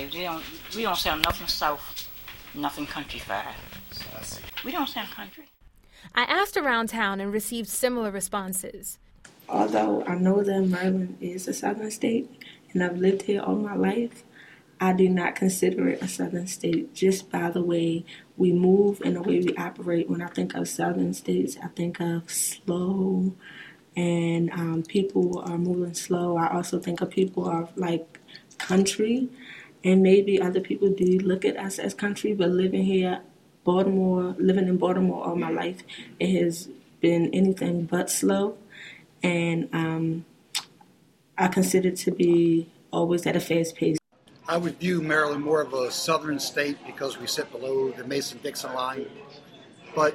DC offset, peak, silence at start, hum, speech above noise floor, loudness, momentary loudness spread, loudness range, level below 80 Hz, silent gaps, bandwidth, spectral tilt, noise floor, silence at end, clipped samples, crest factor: under 0.1%; -4 dBFS; 0 s; none; 34 dB; -26 LUFS; 13 LU; 4 LU; -56 dBFS; none; 16.5 kHz; -5 dB/octave; -59 dBFS; 0 s; under 0.1%; 22 dB